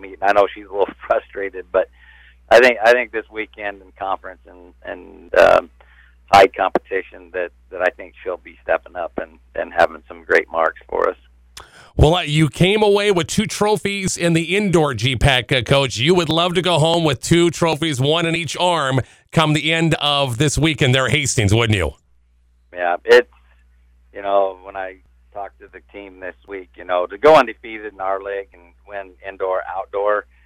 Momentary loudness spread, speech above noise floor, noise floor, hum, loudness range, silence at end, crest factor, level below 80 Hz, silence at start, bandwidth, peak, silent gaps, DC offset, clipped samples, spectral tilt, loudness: 19 LU; 38 dB; -56 dBFS; 60 Hz at -45 dBFS; 5 LU; 0.25 s; 16 dB; -38 dBFS; 0 s; 16.5 kHz; -2 dBFS; none; under 0.1%; under 0.1%; -4.5 dB/octave; -17 LUFS